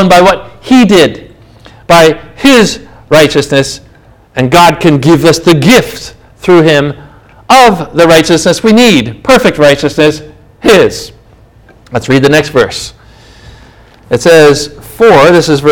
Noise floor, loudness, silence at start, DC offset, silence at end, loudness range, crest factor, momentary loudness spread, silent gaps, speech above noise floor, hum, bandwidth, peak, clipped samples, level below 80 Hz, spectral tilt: -39 dBFS; -6 LUFS; 0 s; under 0.1%; 0 s; 4 LU; 8 dB; 14 LU; none; 34 dB; none; over 20 kHz; 0 dBFS; 10%; -34 dBFS; -5 dB/octave